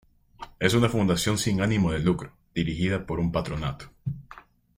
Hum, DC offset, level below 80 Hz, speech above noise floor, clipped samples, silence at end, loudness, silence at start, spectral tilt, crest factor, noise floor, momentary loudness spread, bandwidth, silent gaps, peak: none; under 0.1%; -44 dBFS; 25 dB; under 0.1%; 0.35 s; -26 LUFS; 0.4 s; -5.5 dB/octave; 20 dB; -50 dBFS; 13 LU; 16 kHz; none; -6 dBFS